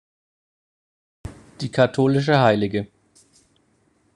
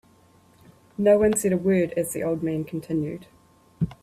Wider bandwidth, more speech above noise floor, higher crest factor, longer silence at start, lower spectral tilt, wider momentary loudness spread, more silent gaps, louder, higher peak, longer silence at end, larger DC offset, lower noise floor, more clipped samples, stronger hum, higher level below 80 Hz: second, 10.5 kHz vs 15.5 kHz; first, 45 dB vs 34 dB; about the same, 22 dB vs 18 dB; first, 1.25 s vs 1 s; about the same, -7 dB/octave vs -6.5 dB/octave; first, 24 LU vs 13 LU; neither; first, -19 LUFS vs -24 LUFS; first, -2 dBFS vs -6 dBFS; first, 1.3 s vs 0.1 s; neither; first, -63 dBFS vs -57 dBFS; neither; neither; about the same, -52 dBFS vs -54 dBFS